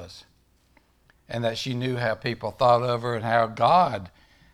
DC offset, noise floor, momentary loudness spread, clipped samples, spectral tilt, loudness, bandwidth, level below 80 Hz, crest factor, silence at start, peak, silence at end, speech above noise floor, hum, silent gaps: under 0.1%; -62 dBFS; 11 LU; under 0.1%; -6 dB/octave; -24 LUFS; 13.5 kHz; -58 dBFS; 20 dB; 0 s; -6 dBFS; 0.45 s; 39 dB; none; none